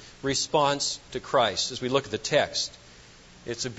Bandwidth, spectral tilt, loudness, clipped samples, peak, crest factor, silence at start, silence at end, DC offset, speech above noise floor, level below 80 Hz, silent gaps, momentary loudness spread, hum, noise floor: 8.2 kHz; -2.5 dB/octave; -26 LUFS; under 0.1%; -8 dBFS; 20 dB; 0 s; 0 s; under 0.1%; 24 dB; -56 dBFS; none; 10 LU; none; -51 dBFS